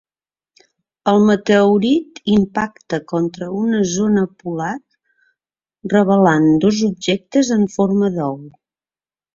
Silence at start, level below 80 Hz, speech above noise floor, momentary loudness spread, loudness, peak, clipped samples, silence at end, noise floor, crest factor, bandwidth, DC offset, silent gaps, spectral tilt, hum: 1.05 s; -54 dBFS; over 74 dB; 11 LU; -16 LUFS; 0 dBFS; under 0.1%; 0.85 s; under -90 dBFS; 16 dB; 7.6 kHz; under 0.1%; none; -6 dB/octave; none